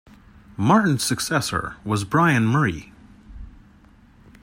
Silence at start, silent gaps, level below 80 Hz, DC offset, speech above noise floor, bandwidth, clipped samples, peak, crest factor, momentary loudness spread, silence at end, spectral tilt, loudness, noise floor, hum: 0.6 s; none; -48 dBFS; under 0.1%; 31 dB; 16 kHz; under 0.1%; -4 dBFS; 20 dB; 9 LU; 0.95 s; -5 dB/octave; -21 LUFS; -51 dBFS; none